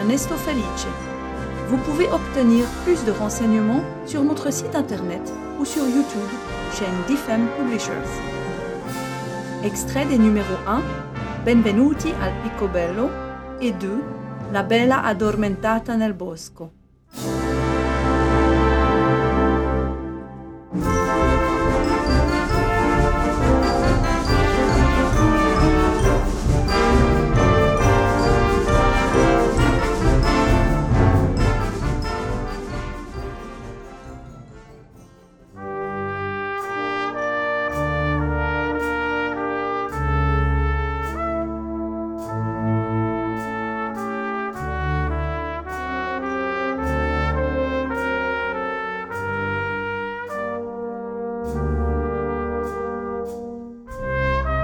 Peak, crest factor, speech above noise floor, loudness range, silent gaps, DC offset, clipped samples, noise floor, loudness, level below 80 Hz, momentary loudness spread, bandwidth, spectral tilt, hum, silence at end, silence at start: -4 dBFS; 16 dB; 27 dB; 8 LU; none; under 0.1%; under 0.1%; -48 dBFS; -21 LUFS; -28 dBFS; 12 LU; 18.5 kHz; -6 dB/octave; none; 0 s; 0 s